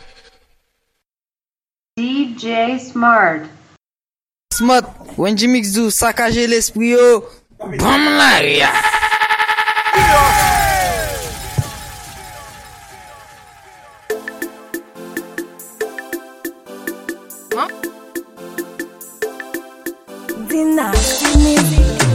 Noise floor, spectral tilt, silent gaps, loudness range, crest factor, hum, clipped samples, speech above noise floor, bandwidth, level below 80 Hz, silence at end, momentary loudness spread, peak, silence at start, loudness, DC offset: under -90 dBFS; -3.5 dB/octave; none; 16 LU; 16 dB; none; under 0.1%; over 77 dB; 16.5 kHz; -28 dBFS; 0 s; 20 LU; 0 dBFS; 1.95 s; -14 LUFS; under 0.1%